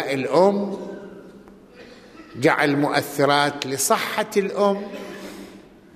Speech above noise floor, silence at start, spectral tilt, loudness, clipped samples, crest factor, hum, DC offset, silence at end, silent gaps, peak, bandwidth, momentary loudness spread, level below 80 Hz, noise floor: 25 dB; 0 s; -4 dB/octave; -20 LUFS; under 0.1%; 20 dB; none; under 0.1%; 0.35 s; none; -4 dBFS; 15 kHz; 20 LU; -62 dBFS; -46 dBFS